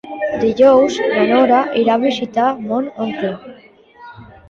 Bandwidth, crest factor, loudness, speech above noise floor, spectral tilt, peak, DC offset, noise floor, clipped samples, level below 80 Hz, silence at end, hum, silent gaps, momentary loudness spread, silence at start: 7.6 kHz; 14 dB; -15 LUFS; 30 dB; -5.5 dB/octave; -2 dBFS; under 0.1%; -44 dBFS; under 0.1%; -54 dBFS; 0.25 s; none; none; 12 LU; 0.05 s